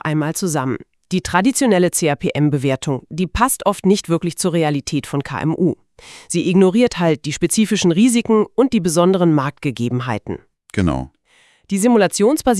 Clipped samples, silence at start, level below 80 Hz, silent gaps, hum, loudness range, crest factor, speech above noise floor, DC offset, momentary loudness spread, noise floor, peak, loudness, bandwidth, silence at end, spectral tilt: under 0.1%; 0.05 s; -42 dBFS; none; none; 3 LU; 16 dB; 38 dB; under 0.1%; 10 LU; -55 dBFS; 0 dBFS; -17 LUFS; 12 kHz; 0 s; -5.5 dB/octave